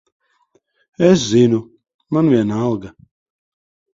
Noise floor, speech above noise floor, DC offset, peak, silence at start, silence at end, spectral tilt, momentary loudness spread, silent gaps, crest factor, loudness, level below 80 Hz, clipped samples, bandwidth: -61 dBFS; 47 dB; under 0.1%; 0 dBFS; 1 s; 1.05 s; -6.5 dB/octave; 9 LU; 1.94-1.99 s; 18 dB; -16 LUFS; -52 dBFS; under 0.1%; 7.8 kHz